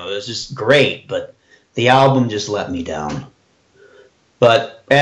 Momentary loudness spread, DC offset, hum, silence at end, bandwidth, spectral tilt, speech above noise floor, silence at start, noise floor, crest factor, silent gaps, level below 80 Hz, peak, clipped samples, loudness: 14 LU; under 0.1%; none; 0 s; 10 kHz; -5 dB/octave; 38 dB; 0 s; -54 dBFS; 16 dB; none; -52 dBFS; 0 dBFS; under 0.1%; -16 LUFS